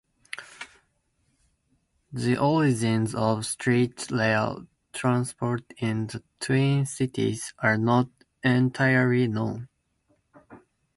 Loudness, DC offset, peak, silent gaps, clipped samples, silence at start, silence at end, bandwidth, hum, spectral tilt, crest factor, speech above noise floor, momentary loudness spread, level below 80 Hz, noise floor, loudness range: -25 LUFS; under 0.1%; -6 dBFS; none; under 0.1%; 0.4 s; 0.4 s; 11.5 kHz; none; -6 dB/octave; 20 dB; 47 dB; 17 LU; -60 dBFS; -71 dBFS; 3 LU